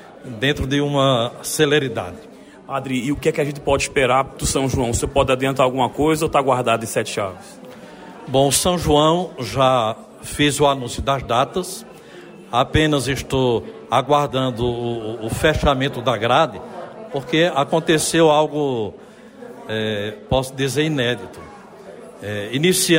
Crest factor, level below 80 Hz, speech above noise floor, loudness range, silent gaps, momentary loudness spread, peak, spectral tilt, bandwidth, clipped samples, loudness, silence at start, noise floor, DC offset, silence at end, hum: 16 dB; -38 dBFS; 21 dB; 3 LU; none; 18 LU; -4 dBFS; -4.5 dB/octave; 16 kHz; under 0.1%; -19 LUFS; 0 s; -40 dBFS; under 0.1%; 0 s; none